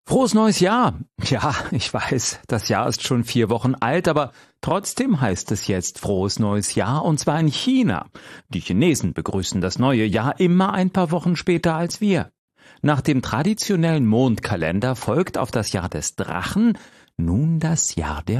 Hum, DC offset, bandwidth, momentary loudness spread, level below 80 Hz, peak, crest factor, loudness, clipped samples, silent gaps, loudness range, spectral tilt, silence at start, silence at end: none; under 0.1%; 14 kHz; 7 LU; -44 dBFS; -6 dBFS; 14 dB; -21 LUFS; under 0.1%; 12.38-12.48 s; 2 LU; -5 dB/octave; 0.05 s; 0 s